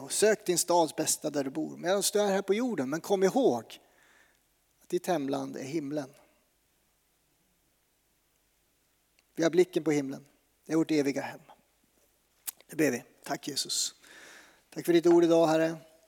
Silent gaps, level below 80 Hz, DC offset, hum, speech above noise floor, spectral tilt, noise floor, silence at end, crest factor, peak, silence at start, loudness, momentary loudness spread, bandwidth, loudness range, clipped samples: none; -80 dBFS; under 0.1%; none; 44 dB; -4 dB/octave; -72 dBFS; 0.25 s; 18 dB; -12 dBFS; 0 s; -29 LUFS; 16 LU; over 20 kHz; 9 LU; under 0.1%